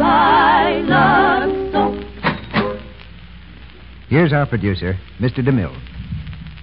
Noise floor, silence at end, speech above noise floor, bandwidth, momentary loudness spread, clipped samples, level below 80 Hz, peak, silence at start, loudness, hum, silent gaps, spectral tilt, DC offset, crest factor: -38 dBFS; 0 s; 21 dB; 5.4 kHz; 17 LU; under 0.1%; -36 dBFS; -2 dBFS; 0 s; -16 LUFS; none; none; -11.5 dB/octave; 0.6%; 16 dB